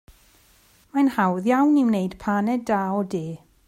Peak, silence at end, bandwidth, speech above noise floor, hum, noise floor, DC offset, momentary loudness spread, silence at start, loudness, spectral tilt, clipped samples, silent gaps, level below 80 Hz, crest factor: -8 dBFS; 0.3 s; 14.5 kHz; 36 dB; none; -57 dBFS; under 0.1%; 10 LU; 0.95 s; -22 LUFS; -7.5 dB/octave; under 0.1%; none; -58 dBFS; 16 dB